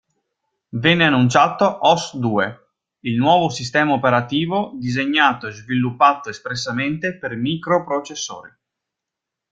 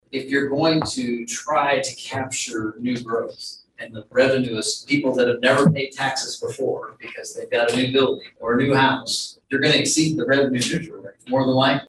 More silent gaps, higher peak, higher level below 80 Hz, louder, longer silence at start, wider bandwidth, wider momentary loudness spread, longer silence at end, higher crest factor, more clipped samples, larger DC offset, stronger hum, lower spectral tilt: neither; first, 0 dBFS vs -4 dBFS; about the same, -58 dBFS vs -58 dBFS; first, -18 LUFS vs -21 LUFS; first, 0.75 s vs 0.15 s; second, 9.2 kHz vs 12.5 kHz; about the same, 12 LU vs 14 LU; first, 1.05 s vs 0.05 s; about the same, 20 dB vs 18 dB; neither; neither; neither; about the same, -5 dB/octave vs -4 dB/octave